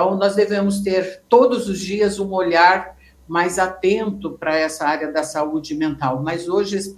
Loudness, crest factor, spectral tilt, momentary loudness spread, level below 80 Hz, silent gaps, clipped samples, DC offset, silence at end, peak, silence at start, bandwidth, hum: -19 LUFS; 18 dB; -5 dB/octave; 9 LU; -52 dBFS; none; under 0.1%; under 0.1%; 0 s; 0 dBFS; 0 s; 15.5 kHz; none